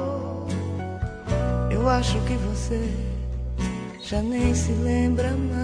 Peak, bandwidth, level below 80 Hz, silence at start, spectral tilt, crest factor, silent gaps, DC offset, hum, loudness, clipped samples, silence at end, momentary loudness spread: -8 dBFS; 11 kHz; -30 dBFS; 0 s; -6.5 dB/octave; 16 dB; none; under 0.1%; none; -25 LUFS; under 0.1%; 0 s; 8 LU